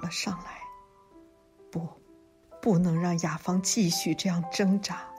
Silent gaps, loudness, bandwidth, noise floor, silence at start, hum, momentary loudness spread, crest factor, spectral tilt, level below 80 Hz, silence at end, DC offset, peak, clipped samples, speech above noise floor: none; -28 LUFS; 15.5 kHz; -58 dBFS; 0 s; none; 16 LU; 16 dB; -4.5 dB/octave; -62 dBFS; 0 s; under 0.1%; -14 dBFS; under 0.1%; 30 dB